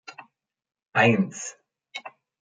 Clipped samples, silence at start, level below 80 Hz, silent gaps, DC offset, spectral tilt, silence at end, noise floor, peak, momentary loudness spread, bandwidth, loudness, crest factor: under 0.1%; 0.1 s; -72 dBFS; none; under 0.1%; -5 dB/octave; 0.35 s; -63 dBFS; -6 dBFS; 23 LU; 9.4 kHz; -22 LUFS; 22 dB